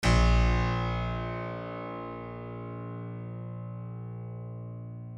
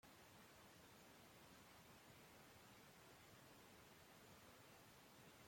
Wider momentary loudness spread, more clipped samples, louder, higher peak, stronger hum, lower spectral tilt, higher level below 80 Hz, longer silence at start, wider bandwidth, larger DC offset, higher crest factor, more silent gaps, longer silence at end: first, 15 LU vs 0 LU; neither; first, -33 LUFS vs -65 LUFS; first, -12 dBFS vs -52 dBFS; first, 60 Hz at -60 dBFS vs none; first, -6 dB/octave vs -3.5 dB/octave; first, -34 dBFS vs -84 dBFS; about the same, 0 s vs 0.05 s; second, 10.5 kHz vs 16.5 kHz; neither; about the same, 18 dB vs 14 dB; neither; about the same, 0 s vs 0 s